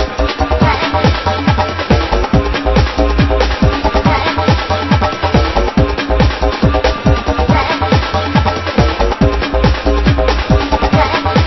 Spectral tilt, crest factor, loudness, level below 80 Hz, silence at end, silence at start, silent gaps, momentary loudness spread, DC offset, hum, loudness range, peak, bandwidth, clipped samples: -6.5 dB/octave; 12 dB; -13 LUFS; -18 dBFS; 0 s; 0 s; none; 2 LU; under 0.1%; none; 0 LU; 0 dBFS; 6.2 kHz; under 0.1%